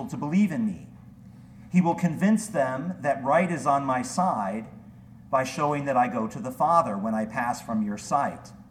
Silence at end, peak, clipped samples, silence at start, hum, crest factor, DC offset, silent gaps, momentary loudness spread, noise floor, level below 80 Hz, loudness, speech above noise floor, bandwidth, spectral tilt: 0.1 s; -8 dBFS; under 0.1%; 0 s; none; 18 dB; under 0.1%; none; 8 LU; -47 dBFS; -60 dBFS; -26 LUFS; 22 dB; 15 kHz; -6.5 dB/octave